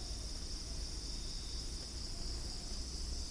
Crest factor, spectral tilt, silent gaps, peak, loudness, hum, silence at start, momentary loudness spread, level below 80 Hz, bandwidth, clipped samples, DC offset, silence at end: 12 dB; -3 dB/octave; none; -30 dBFS; -43 LUFS; none; 0 s; 1 LU; -44 dBFS; 10.5 kHz; under 0.1%; under 0.1%; 0 s